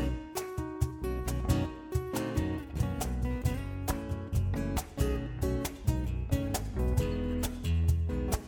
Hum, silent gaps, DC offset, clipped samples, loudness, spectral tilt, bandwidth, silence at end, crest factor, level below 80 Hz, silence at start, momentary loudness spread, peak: none; none; under 0.1%; under 0.1%; -33 LUFS; -6 dB/octave; 19.5 kHz; 0 s; 18 dB; -36 dBFS; 0 s; 5 LU; -14 dBFS